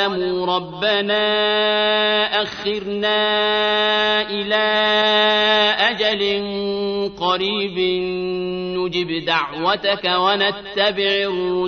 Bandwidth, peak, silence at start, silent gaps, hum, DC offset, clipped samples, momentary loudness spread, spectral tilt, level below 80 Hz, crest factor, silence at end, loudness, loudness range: 6.6 kHz; -4 dBFS; 0 s; none; none; under 0.1%; under 0.1%; 8 LU; -4.5 dB/octave; -54 dBFS; 16 dB; 0 s; -18 LUFS; 5 LU